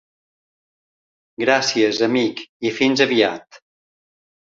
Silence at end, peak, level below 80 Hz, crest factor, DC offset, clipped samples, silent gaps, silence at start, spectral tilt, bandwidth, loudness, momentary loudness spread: 1.05 s; -2 dBFS; -66 dBFS; 20 dB; under 0.1%; under 0.1%; 2.49-2.60 s; 1.4 s; -3.5 dB/octave; 7.8 kHz; -18 LUFS; 9 LU